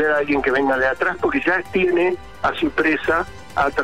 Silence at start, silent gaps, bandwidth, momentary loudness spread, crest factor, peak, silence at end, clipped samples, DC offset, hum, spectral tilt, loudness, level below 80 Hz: 0 s; none; 13 kHz; 4 LU; 12 dB; -8 dBFS; 0 s; under 0.1%; 0.9%; none; -5.5 dB/octave; -19 LUFS; -44 dBFS